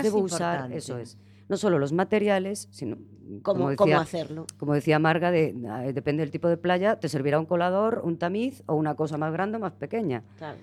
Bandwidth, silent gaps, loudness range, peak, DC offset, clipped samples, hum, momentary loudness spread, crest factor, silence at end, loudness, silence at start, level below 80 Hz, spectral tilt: 14 kHz; none; 3 LU; -8 dBFS; under 0.1%; under 0.1%; 50 Hz at -50 dBFS; 12 LU; 18 dB; 0 s; -26 LUFS; 0 s; -68 dBFS; -6.5 dB/octave